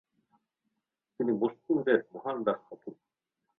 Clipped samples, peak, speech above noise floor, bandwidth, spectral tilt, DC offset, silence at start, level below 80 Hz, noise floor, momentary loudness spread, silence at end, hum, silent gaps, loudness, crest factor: under 0.1%; -12 dBFS; 54 dB; 4 kHz; -9.5 dB/octave; under 0.1%; 1.2 s; -76 dBFS; -85 dBFS; 20 LU; 0.65 s; none; none; -31 LUFS; 22 dB